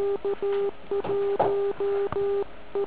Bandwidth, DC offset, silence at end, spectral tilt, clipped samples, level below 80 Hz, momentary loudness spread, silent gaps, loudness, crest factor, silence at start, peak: 4 kHz; 1%; 0 s; -5 dB/octave; under 0.1%; -56 dBFS; 5 LU; none; -27 LUFS; 16 dB; 0 s; -10 dBFS